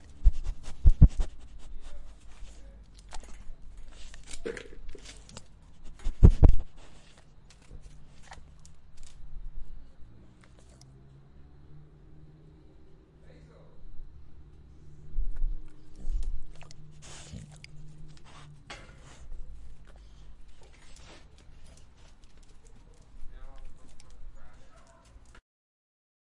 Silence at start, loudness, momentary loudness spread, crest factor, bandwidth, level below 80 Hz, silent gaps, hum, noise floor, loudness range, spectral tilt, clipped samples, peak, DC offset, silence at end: 0.1 s; -29 LUFS; 27 LU; 26 dB; 9.4 kHz; -32 dBFS; none; none; -53 dBFS; 26 LU; -7.5 dB/octave; under 0.1%; -2 dBFS; under 0.1%; 1.65 s